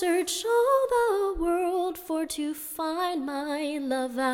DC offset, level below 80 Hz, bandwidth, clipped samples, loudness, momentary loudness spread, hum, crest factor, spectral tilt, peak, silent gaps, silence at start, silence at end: under 0.1%; -50 dBFS; 17.5 kHz; under 0.1%; -27 LUFS; 8 LU; none; 14 dB; -2.5 dB/octave; -12 dBFS; none; 0 s; 0 s